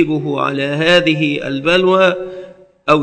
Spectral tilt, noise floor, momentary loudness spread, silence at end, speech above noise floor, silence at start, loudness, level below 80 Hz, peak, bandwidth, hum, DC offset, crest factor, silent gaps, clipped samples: -5.5 dB/octave; -36 dBFS; 13 LU; 0 s; 22 dB; 0 s; -14 LUFS; -48 dBFS; 0 dBFS; 11 kHz; none; under 0.1%; 14 dB; none; 0.1%